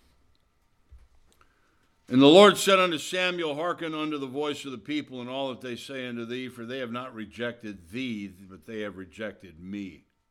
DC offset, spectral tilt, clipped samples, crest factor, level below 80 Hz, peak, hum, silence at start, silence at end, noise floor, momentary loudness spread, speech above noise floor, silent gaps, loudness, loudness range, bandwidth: under 0.1%; -4.5 dB/octave; under 0.1%; 24 dB; -66 dBFS; -4 dBFS; none; 0.9 s; 0.4 s; -67 dBFS; 21 LU; 40 dB; none; -25 LUFS; 14 LU; 16.5 kHz